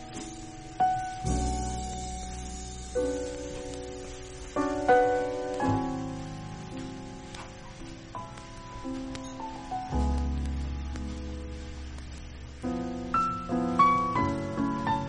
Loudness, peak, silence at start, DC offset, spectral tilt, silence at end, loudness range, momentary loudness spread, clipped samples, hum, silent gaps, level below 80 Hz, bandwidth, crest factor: -31 LUFS; -12 dBFS; 0 s; under 0.1%; -5.5 dB/octave; 0 s; 9 LU; 18 LU; under 0.1%; none; none; -40 dBFS; 11 kHz; 20 dB